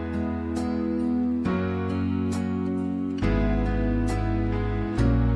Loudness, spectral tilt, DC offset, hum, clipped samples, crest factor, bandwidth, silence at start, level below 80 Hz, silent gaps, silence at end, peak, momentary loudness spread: -26 LUFS; -8 dB/octave; under 0.1%; none; under 0.1%; 14 dB; 11 kHz; 0 s; -32 dBFS; none; 0 s; -10 dBFS; 4 LU